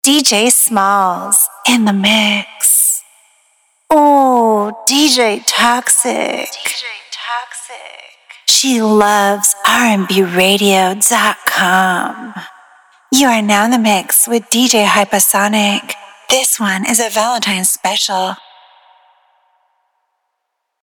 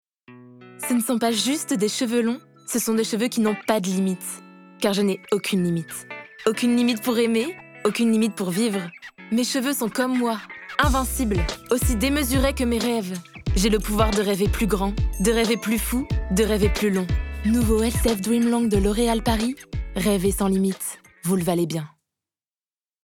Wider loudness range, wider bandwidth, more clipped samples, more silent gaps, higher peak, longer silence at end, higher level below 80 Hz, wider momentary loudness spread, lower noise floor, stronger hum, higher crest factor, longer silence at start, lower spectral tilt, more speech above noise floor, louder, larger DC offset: about the same, 4 LU vs 2 LU; about the same, over 20 kHz vs 19 kHz; neither; neither; about the same, 0 dBFS vs -2 dBFS; first, 2.5 s vs 1.2 s; second, -58 dBFS vs -32 dBFS; first, 12 LU vs 9 LU; second, -73 dBFS vs under -90 dBFS; neither; second, 12 dB vs 20 dB; second, 0.05 s vs 0.3 s; second, -2 dB/octave vs -5 dB/octave; second, 60 dB vs over 68 dB; first, -11 LUFS vs -23 LUFS; neither